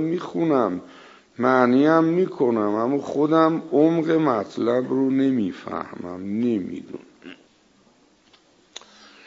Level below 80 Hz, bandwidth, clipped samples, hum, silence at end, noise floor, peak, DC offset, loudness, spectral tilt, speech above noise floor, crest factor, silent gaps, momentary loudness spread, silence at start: -70 dBFS; 7.6 kHz; under 0.1%; none; 1.95 s; -58 dBFS; -2 dBFS; under 0.1%; -21 LUFS; -7.5 dB/octave; 37 dB; 20 dB; none; 16 LU; 0 s